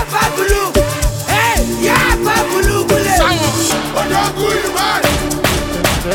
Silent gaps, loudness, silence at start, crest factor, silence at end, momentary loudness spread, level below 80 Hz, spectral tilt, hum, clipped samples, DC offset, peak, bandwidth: none; -14 LUFS; 0 s; 14 dB; 0 s; 4 LU; -24 dBFS; -3.5 dB/octave; none; under 0.1%; under 0.1%; 0 dBFS; 17.5 kHz